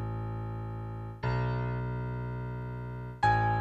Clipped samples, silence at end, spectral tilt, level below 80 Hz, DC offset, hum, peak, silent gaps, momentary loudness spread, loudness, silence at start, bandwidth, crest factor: under 0.1%; 0 s; -8 dB/octave; -46 dBFS; under 0.1%; none; -14 dBFS; none; 12 LU; -34 LUFS; 0 s; 8 kHz; 18 dB